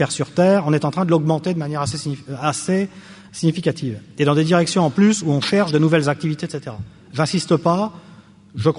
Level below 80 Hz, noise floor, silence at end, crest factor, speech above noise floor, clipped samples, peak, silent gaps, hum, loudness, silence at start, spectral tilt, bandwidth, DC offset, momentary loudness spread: -56 dBFS; -45 dBFS; 0 s; 16 dB; 26 dB; under 0.1%; -4 dBFS; none; none; -19 LUFS; 0 s; -6 dB/octave; 11 kHz; under 0.1%; 12 LU